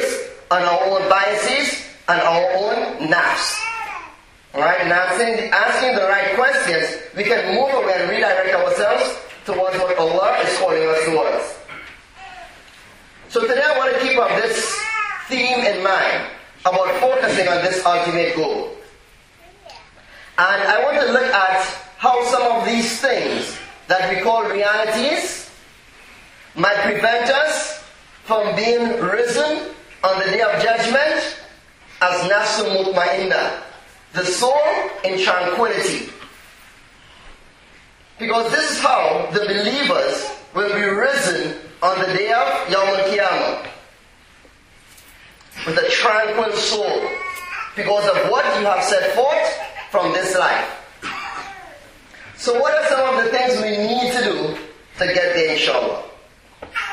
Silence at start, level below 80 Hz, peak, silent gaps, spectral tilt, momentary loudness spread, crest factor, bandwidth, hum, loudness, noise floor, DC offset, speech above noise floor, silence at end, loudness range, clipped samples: 0 s; -56 dBFS; 0 dBFS; none; -2.5 dB/octave; 12 LU; 18 dB; 15.5 kHz; none; -18 LUFS; -49 dBFS; under 0.1%; 31 dB; 0 s; 4 LU; under 0.1%